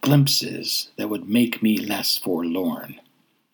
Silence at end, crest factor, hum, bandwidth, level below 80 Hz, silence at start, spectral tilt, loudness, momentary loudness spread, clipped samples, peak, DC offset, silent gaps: 0.55 s; 20 dB; none; over 20 kHz; -74 dBFS; 0 s; -4.5 dB/octave; -22 LUFS; 10 LU; under 0.1%; -4 dBFS; under 0.1%; none